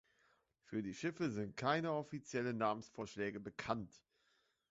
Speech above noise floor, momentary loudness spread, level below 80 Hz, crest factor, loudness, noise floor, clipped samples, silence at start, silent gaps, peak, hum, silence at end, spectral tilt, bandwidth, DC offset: 38 dB; 8 LU; -74 dBFS; 22 dB; -42 LUFS; -80 dBFS; under 0.1%; 0.7 s; none; -22 dBFS; none; 0.75 s; -5 dB/octave; 7.6 kHz; under 0.1%